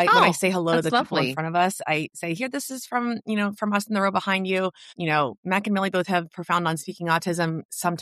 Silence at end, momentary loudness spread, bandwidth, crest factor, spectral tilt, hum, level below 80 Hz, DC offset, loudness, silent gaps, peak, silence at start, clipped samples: 0 s; 7 LU; 14 kHz; 18 dB; -4.5 dB/octave; none; -70 dBFS; under 0.1%; -24 LUFS; 5.38-5.43 s, 7.65-7.69 s; -6 dBFS; 0 s; under 0.1%